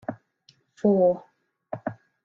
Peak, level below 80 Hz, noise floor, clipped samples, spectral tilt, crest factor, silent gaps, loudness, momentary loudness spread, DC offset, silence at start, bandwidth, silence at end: -10 dBFS; -68 dBFS; -62 dBFS; under 0.1%; -10 dB/octave; 18 dB; none; -25 LUFS; 17 LU; under 0.1%; 0.1 s; 7 kHz; 0.3 s